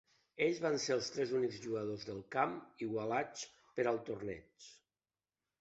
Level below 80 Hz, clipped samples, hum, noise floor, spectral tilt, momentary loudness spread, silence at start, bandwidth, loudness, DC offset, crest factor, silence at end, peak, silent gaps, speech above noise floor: -74 dBFS; under 0.1%; none; under -90 dBFS; -3.5 dB/octave; 14 LU; 0.4 s; 8 kHz; -38 LUFS; under 0.1%; 22 dB; 0.85 s; -18 dBFS; none; over 52 dB